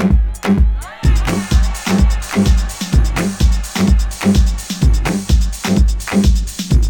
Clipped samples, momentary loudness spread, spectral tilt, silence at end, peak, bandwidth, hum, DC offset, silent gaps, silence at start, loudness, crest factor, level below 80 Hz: under 0.1%; 3 LU; -5.5 dB/octave; 0 s; 0 dBFS; 18.5 kHz; none; under 0.1%; none; 0 s; -16 LUFS; 12 dB; -14 dBFS